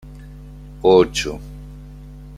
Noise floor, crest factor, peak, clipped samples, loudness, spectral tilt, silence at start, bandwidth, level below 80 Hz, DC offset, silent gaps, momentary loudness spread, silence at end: -37 dBFS; 18 dB; -2 dBFS; under 0.1%; -17 LUFS; -5 dB/octave; 0.05 s; 13.5 kHz; -38 dBFS; under 0.1%; none; 26 LU; 0 s